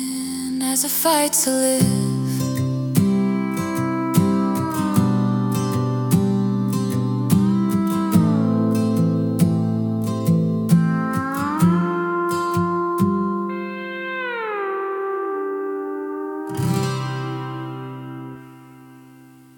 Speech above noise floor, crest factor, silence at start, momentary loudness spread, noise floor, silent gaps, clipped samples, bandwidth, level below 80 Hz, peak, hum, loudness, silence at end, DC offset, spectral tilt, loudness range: 28 dB; 16 dB; 0 s; 10 LU; -46 dBFS; none; under 0.1%; 18 kHz; -56 dBFS; -4 dBFS; none; -20 LUFS; 0.55 s; under 0.1%; -5.5 dB/octave; 7 LU